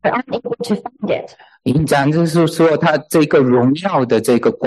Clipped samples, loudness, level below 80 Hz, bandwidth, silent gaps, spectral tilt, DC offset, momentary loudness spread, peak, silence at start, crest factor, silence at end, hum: under 0.1%; -15 LUFS; -48 dBFS; 12.5 kHz; none; -6.5 dB/octave; under 0.1%; 9 LU; -4 dBFS; 0.05 s; 12 dB; 0 s; none